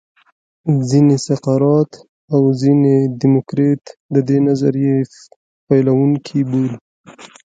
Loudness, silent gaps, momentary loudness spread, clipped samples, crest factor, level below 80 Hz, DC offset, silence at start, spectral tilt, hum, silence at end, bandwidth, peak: -15 LUFS; 2.09-2.28 s, 4.00-4.09 s, 5.36-5.67 s, 6.81-7.04 s; 7 LU; under 0.1%; 14 dB; -58 dBFS; under 0.1%; 0.65 s; -8 dB/octave; none; 0.3 s; 9 kHz; 0 dBFS